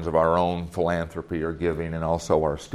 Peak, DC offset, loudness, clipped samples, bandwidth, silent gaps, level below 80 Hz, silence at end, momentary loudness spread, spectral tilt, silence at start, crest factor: -6 dBFS; under 0.1%; -25 LUFS; under 0.1%; 13.5 kHz; none; -46 dBFS; 0 s; 8 LU; -6.5 dB/octave; 0 s; 18 dB